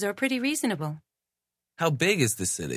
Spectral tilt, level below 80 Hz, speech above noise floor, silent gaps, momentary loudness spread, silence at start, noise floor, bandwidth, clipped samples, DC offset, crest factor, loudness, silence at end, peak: -4 dB/octave; -58 dBFS; 61 dB; none; 10 LU; 0 s; -88 dBFS; 16 kHz; under 0.1%; under 0.1%; 20 dB; -26 LUFS; 0 s; -8 dBFS